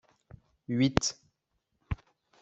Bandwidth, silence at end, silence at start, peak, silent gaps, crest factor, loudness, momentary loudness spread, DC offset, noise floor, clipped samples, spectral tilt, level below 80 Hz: 8.2 kHz; 0.45 s; 0.7 s; -2 dBFS; none; 32 dB; -31 LUFS; 21 LU; under 0.1%; -80 dBFS; under 0.1%; -4.5 dB/octave; -50 dBFS